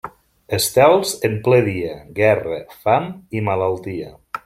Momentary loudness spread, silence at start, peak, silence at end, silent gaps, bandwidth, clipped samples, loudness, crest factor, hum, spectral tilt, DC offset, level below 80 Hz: 14 LU; 0.05 s; -2 dBFS; 0.1 s; none; 16.5 kHz; under 0.1%; -18 LUFS; 18 dB; none; -5 dB/octave; under 0.1%; -52 dBFS